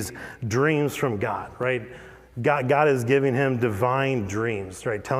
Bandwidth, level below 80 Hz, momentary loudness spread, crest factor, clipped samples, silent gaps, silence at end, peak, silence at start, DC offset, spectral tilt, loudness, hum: 16 kHz; -56 dBFS; 11 LU; 18 dB; under 0.1%; none; 0 s; -6 dBFS; 0 s; under 0.1%; -6 dB/octave; -24 LUFS; none